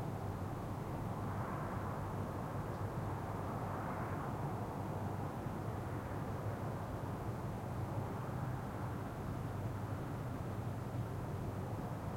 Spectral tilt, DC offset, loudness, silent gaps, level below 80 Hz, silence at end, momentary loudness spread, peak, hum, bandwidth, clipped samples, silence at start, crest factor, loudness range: -7.5 dB/octave; under 0.1%; -42 LUFS; none; -56 dBFS; 0 s; 2 LU; -28 dBFS; none; 16.5 kHz; under 0.1%; 0 s; 12 dB; 1 LU